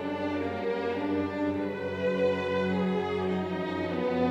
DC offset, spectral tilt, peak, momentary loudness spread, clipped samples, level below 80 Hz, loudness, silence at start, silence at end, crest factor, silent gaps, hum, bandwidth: under 0.1%; -7.5 dB/octave; -16 dBFS; 4 LU; under 0.1%; -72 dBFS; -30 LUFS; 0 s; 0 s; 14 dB; none; none; 8.2 kHz